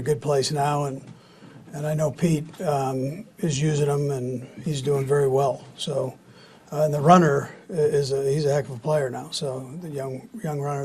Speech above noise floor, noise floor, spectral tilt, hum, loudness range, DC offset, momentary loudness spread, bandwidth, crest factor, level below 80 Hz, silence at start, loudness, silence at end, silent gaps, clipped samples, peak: 26 dB; -49 dBFS; -6 dB/octave; none; 4 LU; under 0.1%; 11 LU; 13 kHz; 22 dB; -58 dBFS; 0 s; -24 LUFS; 0 s; none; under 0.1%; -2 dBFS